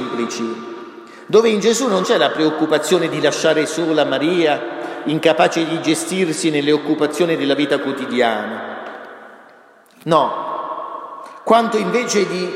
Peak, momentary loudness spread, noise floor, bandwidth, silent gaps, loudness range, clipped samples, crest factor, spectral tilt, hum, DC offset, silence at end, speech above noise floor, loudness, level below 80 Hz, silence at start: 0 dBFS; 15 LU; -47 dBFS; 15.5 kHz; none; 5 LU; under 0.1%; 16 dB; -4 dB/octave; none; under 0.1%; 0 s; 31 dB; -17 LUFS; -68 dBFS; 0 s